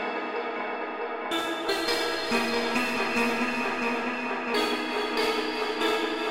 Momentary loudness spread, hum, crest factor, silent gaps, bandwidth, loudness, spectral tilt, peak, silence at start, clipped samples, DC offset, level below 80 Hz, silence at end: 6 LU; none; 14 dB; none; 16 kHz; -27 LUFS; -2.5 dB/octave; -14 dBFS; 0 s; under 0.1%; 0.3%; -62 dBFS; 0 s